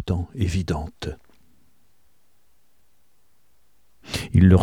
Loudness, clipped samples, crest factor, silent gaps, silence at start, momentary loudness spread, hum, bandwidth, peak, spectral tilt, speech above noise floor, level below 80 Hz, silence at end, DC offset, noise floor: -24 LUFS; under 0.1%; 22 dB; none; 0 s; 18 LU; none; 12.5 kHz; -2 dBFS; -7 dB/octave; 48 dB; -40 dBFS; 0 s; 0.3%; -67 dBFS